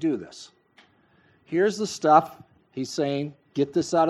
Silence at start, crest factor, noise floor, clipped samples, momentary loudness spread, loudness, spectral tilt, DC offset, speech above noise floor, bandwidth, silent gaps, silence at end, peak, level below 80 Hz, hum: 0 s; 22 dB; -61 dBFS; under 0.1%; 21 LU; -25 LUFS; -5.5 dB/octave; under 0.1%; 37 dB; 13 kHz; none; 0 s; -4 dBFS; -70 dBFS; none